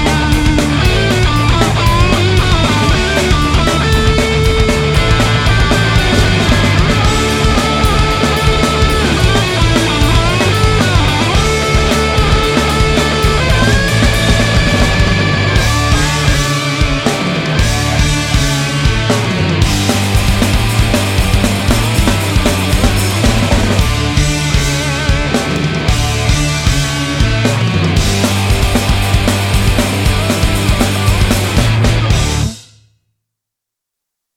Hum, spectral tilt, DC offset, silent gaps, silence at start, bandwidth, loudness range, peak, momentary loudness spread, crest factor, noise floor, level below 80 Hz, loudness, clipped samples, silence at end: none; -4.5 dB/octave; under 0.1%; none; 0 s; 16.5 kHz; 2 LU; 0 dBFS; 3 LU; 12 dB; -80 dBFS; -18 dBFS; -12 LUFS; under 0.1%; 1.75 s